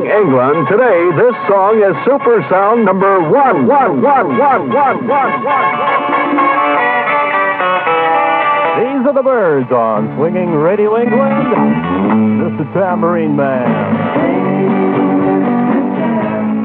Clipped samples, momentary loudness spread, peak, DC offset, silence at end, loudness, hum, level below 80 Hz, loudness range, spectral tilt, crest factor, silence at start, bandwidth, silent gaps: under 0.1%; 4 LU; 0 dBFS; under 0.1%; 0 s; -12 LUFS; none; -54 dBFS; 3 LU; -10.5 dB/octave; 10 dB; 0 s; 4.4 kHz; none